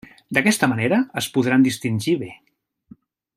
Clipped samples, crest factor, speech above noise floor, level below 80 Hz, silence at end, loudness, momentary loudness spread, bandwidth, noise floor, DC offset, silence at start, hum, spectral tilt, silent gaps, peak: under 0.1%; 20 dB; 31 dB; -62 dBFS; 1 s; -20 LUFS; 6 LU; 15.5 kHz; -50 dBFS; under 0.1%; 0.3 s; none; -5 dB/octave; none; -2 dBFS